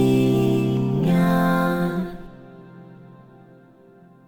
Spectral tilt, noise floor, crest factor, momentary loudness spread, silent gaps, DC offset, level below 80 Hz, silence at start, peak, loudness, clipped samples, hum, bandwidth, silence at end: -8 dB/octave; -50 dBFS; 14 dB; 14 LU; none; under 0.1%; -48 dBFS; 0 s; -8 dBFS; -20 LUFS; under 0.1%; none; 17.5 kHz; 1.1 s